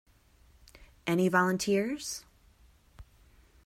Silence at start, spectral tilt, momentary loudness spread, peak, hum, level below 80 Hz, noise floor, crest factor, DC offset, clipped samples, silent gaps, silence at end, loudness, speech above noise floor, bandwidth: 0.75 s; -5 dB/octave; 13 LU; -12 dBFS; none; -60 dBFS; -62 dBFS; 22 dB; under 0.1%; under 0.1%; none; 0.65 s; -30 LUFS; 33 dB; 16 kHz